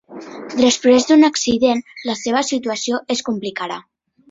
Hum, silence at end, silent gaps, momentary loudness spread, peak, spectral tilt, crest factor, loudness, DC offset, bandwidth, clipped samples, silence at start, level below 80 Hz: none; 0.5 s; none; 14 LU; -2 dBFS; -3 dB/octave; 16 dB; -17 LUFS; under 0.1%; 8 kHz; under 0.1%; 0.1 s; -56 dBFS